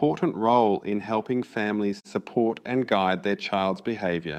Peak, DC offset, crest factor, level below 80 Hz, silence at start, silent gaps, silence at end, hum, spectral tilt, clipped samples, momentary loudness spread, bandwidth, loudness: -6 dBFS; under 0.1%; 18 dB; -66 dBFS; 0 s; none; 0 s; none; -7 dB/octave; under 0.1%; 7 LU; 9.6 kHz; -26 LUFS